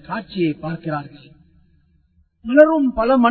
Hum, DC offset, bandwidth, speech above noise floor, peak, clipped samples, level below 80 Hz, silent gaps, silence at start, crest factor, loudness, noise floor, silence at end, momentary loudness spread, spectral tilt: none; under 0.1%; 4.5 kHz; 42 dB; 0 dBFS; under 0.1%; -48 dBFS; none; 0.1 s; 18 dB; -18 LUFS; -59 dBFS; 0 s; 16 LU; -9.5 dB/octave